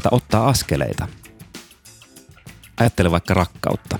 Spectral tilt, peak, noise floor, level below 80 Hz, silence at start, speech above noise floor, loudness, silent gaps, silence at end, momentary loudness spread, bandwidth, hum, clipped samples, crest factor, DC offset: -5.5 dB/octave; -2 dBFS; -47 dBFS; -38 dBFS; 0 s; 28 dB; -19 LUFS; none; 0 s; 22 LU; 20 kHz; none; under 0.1%; 20 dB; under 0.1%